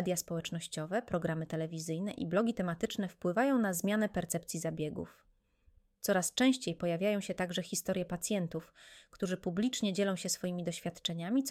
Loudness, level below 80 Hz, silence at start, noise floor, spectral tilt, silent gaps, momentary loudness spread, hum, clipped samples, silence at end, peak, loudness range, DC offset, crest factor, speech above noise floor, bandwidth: -35 LUFS; -66 dBFS; 0 s; -68 dBFS; -4.5 dB/octave; none; 9 LU; none; under 0.1%; 0 s; -16 dBFS; 2 LU; under 0.1%; 18 dB; 34 dB; 16.5 kHz